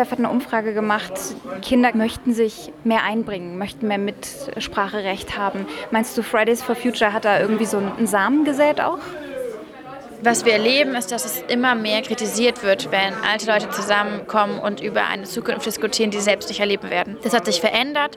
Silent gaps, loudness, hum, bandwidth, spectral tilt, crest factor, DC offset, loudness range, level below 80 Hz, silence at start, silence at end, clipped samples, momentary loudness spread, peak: none; -20 LUFS; none; 17.5 kHz; -3.5 dB/octave; 16 dB; under 0.1%; 4 LU; -54 dBFS; 0 s; 0 s; under 0.1%; 11 LU; -4 dBFS